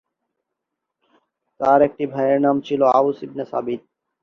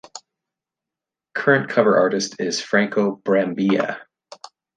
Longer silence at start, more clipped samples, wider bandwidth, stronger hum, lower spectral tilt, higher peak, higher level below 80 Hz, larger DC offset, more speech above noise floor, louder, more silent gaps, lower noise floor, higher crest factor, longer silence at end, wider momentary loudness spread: first, 1.6 s vs 0.15 s; neither; second, 6.6 kHz vs 9.4 kHz; neither; first, -8 dB/octave vs -5 dB/octave; about the same, -2 dBFS vs -2 dBFS; first, -64 dBFS vs -72 dBFS; neither; second, 63 dB vs 68 dB; about the same, -19 LUFS vs -19 LUFS; neither; second, -81 dBFS vs -87 dBFS; about the same, 18 dB vs 20 dB; second, 0.45 s vs 0.75 s; about the same, 12 LU vs 14 LU